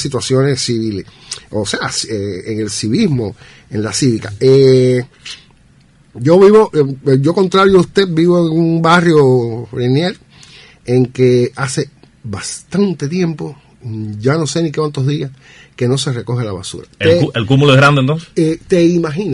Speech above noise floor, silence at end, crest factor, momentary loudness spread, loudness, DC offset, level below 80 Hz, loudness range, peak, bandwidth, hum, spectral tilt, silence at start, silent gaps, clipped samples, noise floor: 35 dB; 0 s; 14 dB; 17 LU; -13 LUFS; under 0.1%; -46 dBFS; 7 LU; 0 dBFS; 11.5 kHz; none; -6 dB/octave; 0 s; none; under 0.1%; -47 dBFS